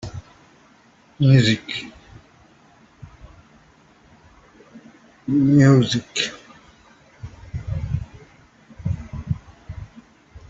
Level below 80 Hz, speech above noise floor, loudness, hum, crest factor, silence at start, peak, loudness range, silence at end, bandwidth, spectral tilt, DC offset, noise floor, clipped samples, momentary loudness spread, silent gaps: -44 dBFS; 37 dB; -20 LUFS; none; 22 dB; 0.05 s; -2 dBFS; 11 LU; 0.1 s; 8 kHz; -6 dB/octave; under 0.1%; -54 dBFS; under 0.1%; 26 LU; none